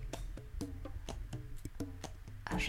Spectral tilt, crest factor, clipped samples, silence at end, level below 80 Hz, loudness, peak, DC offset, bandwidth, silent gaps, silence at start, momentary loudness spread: -4.5 dB/octave; 20 dB; under 0.1%; 0 s; -46 dBFS; -47 LUFS; -22 dBFS; under 0.1%; 17 kHz; none; 0 s; 4 LU